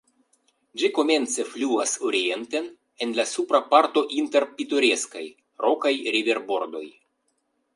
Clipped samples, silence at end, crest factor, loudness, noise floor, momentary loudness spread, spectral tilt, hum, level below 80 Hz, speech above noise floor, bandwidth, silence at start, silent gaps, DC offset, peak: under 0.1%; 0.85 s; 22 dB; -23 LUFS; -73 dBFS; 14 LU; -1 dB/octave; none; -80 dBFS; 49 dB; 11.5 kHz; 0.75 s; none; under 0.1%; -4 dBFS